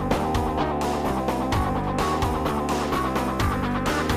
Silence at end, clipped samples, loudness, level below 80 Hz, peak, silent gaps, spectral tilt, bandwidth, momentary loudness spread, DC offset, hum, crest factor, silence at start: 0 s; under 0.1%; -25 LUFS; -34 dBFS; -10 dBFS; none; -5.5 dB/octave; 15.5 kHz; 1 LU; under 0.1%; none; 14 dB; 0 s